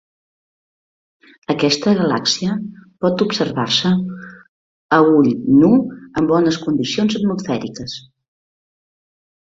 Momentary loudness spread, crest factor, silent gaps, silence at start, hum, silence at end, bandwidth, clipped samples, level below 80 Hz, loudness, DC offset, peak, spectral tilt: 15 LU; 16 dB; 4.49-4.89 s; 1.5 s; none; 1.55 s; 7.8 kHz; under 0.1%; -54 dBFS; -17 LUFS; under 0.1%; -2 dBFS; -5.5 dB/octave